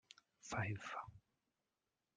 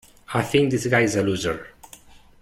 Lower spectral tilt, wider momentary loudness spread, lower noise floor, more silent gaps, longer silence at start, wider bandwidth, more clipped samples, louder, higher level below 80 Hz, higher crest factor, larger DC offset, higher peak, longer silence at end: about the same, -5 dB/octave vs -5 dB/octave; first, 15 LU vs 11 LU; first, under -90 dBFS vs -48 dBFS; neither; first, 0.45 s vs 0.3 s; second, 9.6 kHz vs 16.5 kHz; neither; second, -46 LUFS vs -22 LUFS; second, -76 dBFS vs -52 dBFS; about the same, 22 dB vs 18 dB; neither; second, -28 dBFS vs -6 dBFS; first, 1 s vs 0.55 s